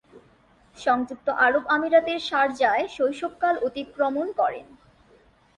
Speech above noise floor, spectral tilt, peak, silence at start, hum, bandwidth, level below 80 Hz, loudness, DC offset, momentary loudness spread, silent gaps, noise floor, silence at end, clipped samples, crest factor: 34 dB; -4 dB/octave; -6 dBFS; 0.15 s; none; 10.5 kHz; -62 dBFS; -24 LUFS; under 0.1%; 7 LU; none; -58 dBFS; 0.95 s; under 0.1%; 18 dB